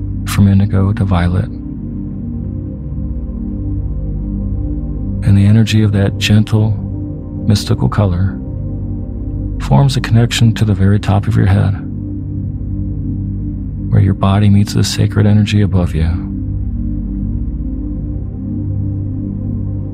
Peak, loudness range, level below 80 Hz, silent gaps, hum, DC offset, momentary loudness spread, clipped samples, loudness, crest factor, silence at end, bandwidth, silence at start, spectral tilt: 0 dBFS; 7 LU; -24 dBFS; none; 50 Hz at -30 dBFS; under 0.1%; 11 LU; under 0.1%; -15 LUFS; 14 dB; 0 s; 13.5 kHz; 0 s; -7 dB/octave